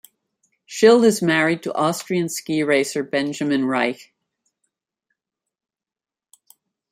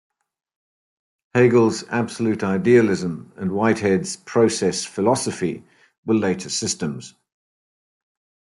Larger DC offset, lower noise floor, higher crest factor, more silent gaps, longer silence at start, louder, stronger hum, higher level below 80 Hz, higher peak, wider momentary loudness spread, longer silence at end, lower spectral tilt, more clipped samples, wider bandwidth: neither; about the same, under -90 dBFS vs under -90 dBFS; about the same, 20 dB vs 18 dB; second, none vs 5.98-6.03 s; second, 0.7 s vs 1.35 s; about the same, -19 LUFS vs -20 LUFS; neither; second, -68 dBFS vs -62 dBFS; about the same, -2 dBFS vs -4 dBFS; second, 9 LU vs 12 LU; first, 2.95 s vs 1.45 s; about the same, -4.5 dB/octave vs -5 dB/octave; neither; first, 16 kHz vs 11.5 kHz